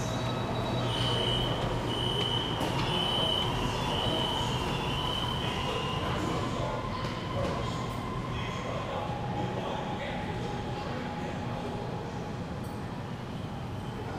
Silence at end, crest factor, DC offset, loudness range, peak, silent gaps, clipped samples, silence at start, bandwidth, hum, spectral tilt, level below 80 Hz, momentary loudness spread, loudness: 0 s; 14 dB; under 0.1%; 7 LU; -16 dBFS; none; under 0.1%; 0 s; 16 kHz; none; -5 dB/octave; -46 dBFS; 9 LU; -32 LUFS